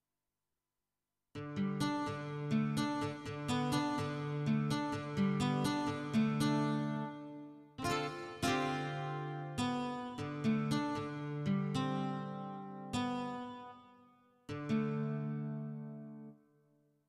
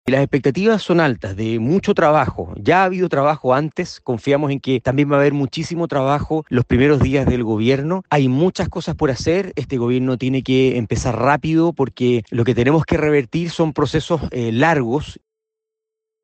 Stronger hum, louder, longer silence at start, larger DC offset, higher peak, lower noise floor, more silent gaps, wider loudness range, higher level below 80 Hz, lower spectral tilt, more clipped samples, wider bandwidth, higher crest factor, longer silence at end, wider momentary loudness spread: neither; second, -37 LUFS vs -18 LUFS; first, 1.35 s vs 0.05 s; neither; second, -20 dBFS vs -4 dBFS; first, under -90 dBFS vs -83 dBFS; neither; first, 6 LU vs 2 LU; second, -68 dBFS vs -40 dBFS; about the same, -6 dB/octave vs -7 dB/octave; neither; first, 14.5 kHz vs 8.6 kHz; about the same, 16 dB vs 14 dB; second, 0.75 s vs 1.1 s; first, 13 LU vs 7 LU